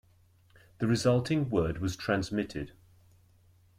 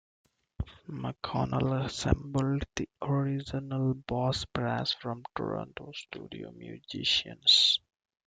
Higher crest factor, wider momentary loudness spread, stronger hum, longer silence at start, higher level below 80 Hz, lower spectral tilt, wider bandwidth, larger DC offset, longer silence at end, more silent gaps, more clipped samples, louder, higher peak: second, 18 dB vs 24 dB; second, 11 LU vs 18 LU; neither; first, 0.8 s vs 0.6 s; second, -54 dBFS vs -48 dBFS; first, -6 dB/octave vs -4.5 dB/octave; first, 15.5 kHz vs 9.4 kHz; neither; first, 1.1 s vs 0.5 s; neither; neither; about the same, -30 LUFS vs -29 LUFS; second, -14 dBFS vs -8 dBFS